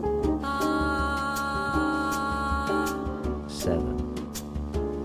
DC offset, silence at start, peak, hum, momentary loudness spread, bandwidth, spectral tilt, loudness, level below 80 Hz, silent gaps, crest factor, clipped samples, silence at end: under 0.1%; 0 s; -12 dBFS; none; 7 LU; 16 kHz; -5.5 dB/octave; -28 LUFS; -36 dBFS; none; 14 dB; under 0.1%; 0 s